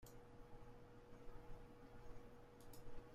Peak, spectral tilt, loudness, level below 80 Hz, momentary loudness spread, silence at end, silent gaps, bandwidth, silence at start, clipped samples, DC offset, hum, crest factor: -40 dBFS; -6 dB/octave; -63 LUFS; -62 dBFS; 3 LU; 0 s; none; 15.5 kHz; 0 s; under 0.1%; under 0.1%; none; 16 dB